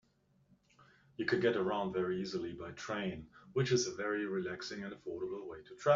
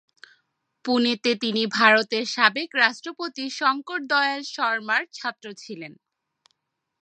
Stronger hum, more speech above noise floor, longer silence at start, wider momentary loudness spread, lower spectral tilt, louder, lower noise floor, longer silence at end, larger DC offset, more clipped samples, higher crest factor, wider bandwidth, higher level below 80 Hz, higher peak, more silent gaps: neither; second, 36 dB vs 51 dB; first, 1.2 s vs 0.85 s; second, 12 LU vs 19 LU; first, -4.5 dB/octave vs -3 dB/octave; second, -37 LUFS vs -22 LUFS; about the same, -72 dBFS vs -75 dBFS; second, 0 s vs 1.05 s; neither; neither; about the same, 20 dB vs 24 dB; second, 7.4 kHz vs 9.4 kHz; first, -70 dBFS vs -80 dBFS; second, -16 dBFS vs 0 dBFS; neither